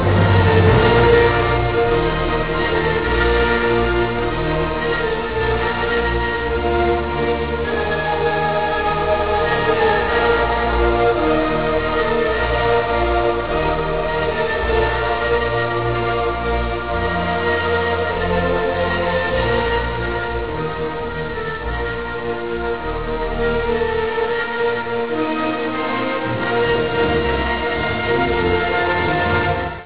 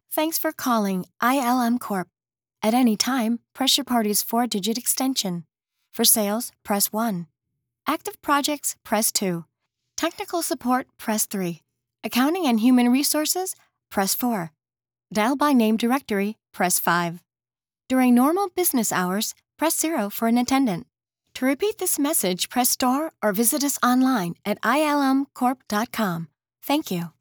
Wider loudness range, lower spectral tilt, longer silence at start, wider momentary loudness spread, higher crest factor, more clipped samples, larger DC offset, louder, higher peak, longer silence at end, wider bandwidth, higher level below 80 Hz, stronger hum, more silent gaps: about the same, 4 LU vs 3 LU; first, -10 dB/octave vs -3 dB/octave; about the same, 0 s vs 0.1 s; second, 6 LU vs 10 LU; about the same, 16 dB vs 20 dB; neither; first, 1% vs under 0.1%; first, -18 LUFS vs -22 LUFS; about the same, -2 dBFS vs -4 dBFS; about the same, 0 s vs 0.1 s; second, 4 kHz vs over 20 kHz; first, -28 dBFS vs -68 dBFS; neither; neither